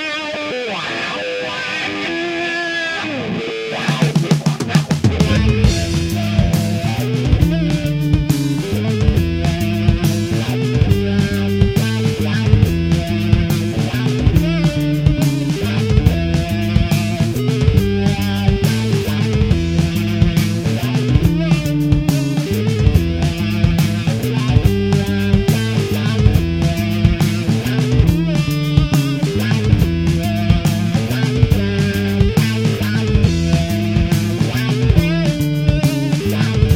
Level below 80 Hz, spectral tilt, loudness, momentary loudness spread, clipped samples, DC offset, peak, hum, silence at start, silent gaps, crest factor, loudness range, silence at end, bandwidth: -24 dBFS; -6.5 dB/octave; -16 LUFS; 4 LU; under 0.1%; under 0.1%; 0 dBFS; none; 0 s; none; 16 dB; 1 LU; 0 s; 16.5 kHz